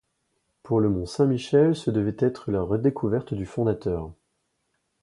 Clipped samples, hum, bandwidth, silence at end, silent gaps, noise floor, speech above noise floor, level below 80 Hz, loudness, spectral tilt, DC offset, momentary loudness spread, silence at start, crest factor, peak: under 0.1%; none; 11.5 kHz; 0.9 s; none; -75 dBFS; 51 dB; -48 dBFS; -25 LUFS; -8 dB/octave; under 0.1%; 9 LU; 0.65 s; 18 dB; -8 dBFS